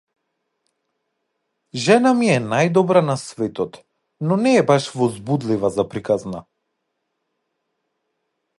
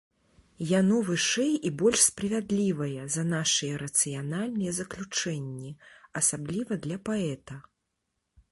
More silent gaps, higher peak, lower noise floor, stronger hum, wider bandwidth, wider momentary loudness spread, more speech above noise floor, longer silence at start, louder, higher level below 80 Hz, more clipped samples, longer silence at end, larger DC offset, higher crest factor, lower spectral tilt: neither; first, -2 dBFS vs -8 dBFS; second, -75 dBFS vs -81 dBFS; neither; about the same, 11.5 kHz vs 12 kHz; about the same, 13 LU vs 14 LU; first, 57 dB vs 52 dB; first, 1.75 s vs 0.6 s; first, -19 LUFS vs -27 LUFS; about the same, -60 dBFS vs -62 dBFS; neither; first, 2.2 s vs 0.9 s; neither; about the same, 20 dB vs 22 dB; first, -6 dB/octave vs -3.5 dB/octave